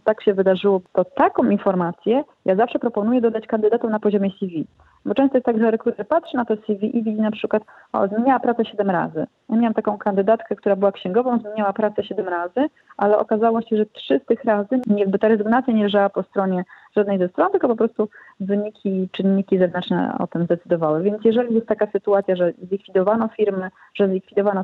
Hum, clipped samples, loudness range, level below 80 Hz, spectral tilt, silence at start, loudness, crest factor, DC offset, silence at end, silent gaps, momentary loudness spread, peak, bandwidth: none; under 0.1%; 2 LU; -64 dBFS; -9.5 dB/octave; 0.05 s; -20 LUFS; 16 dB; under 0.1%; 0 s; none; 6 LU; -4 dBFS; 4.4 kHz